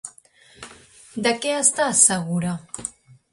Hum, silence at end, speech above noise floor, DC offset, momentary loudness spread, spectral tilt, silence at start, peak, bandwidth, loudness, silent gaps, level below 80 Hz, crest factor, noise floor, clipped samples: none; 0.45 s; 31 dB; under 0.1%; 18 LU; -2.5 dB/octave; 0.05 s; -2 dBFS; 11.5 kHz; -19 LUFS; none; -60 dBFS; 22 dB; -52 dBFS; under 0.1%